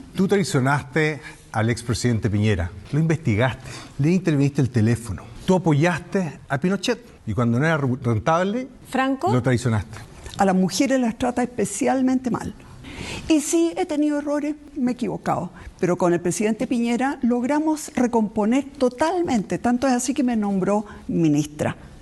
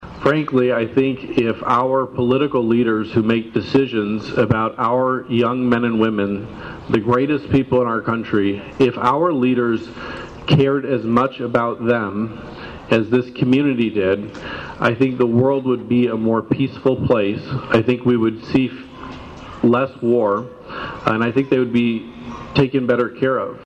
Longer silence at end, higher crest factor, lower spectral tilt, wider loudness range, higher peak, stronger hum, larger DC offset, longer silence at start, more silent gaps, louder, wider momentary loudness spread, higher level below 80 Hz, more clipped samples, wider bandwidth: about the same, 0 s vs 0 s; about the same, 16 dB vs 14 dB; second, -6 dB/octave vs -8 dB/octave; about the same, 2 LU vs 2 LU; about the same, -6 dBFS vs -4 dBFS; neither; neither; about the same, 0.05 s vs 0 s; neither; second, -22 LUFS vs -18 LUFS; second, 8 LU vs 11 LU; about the same, -48 dBFS vs -48 dBFS; neither; first, 12.5 kHz vs 8.2 kHz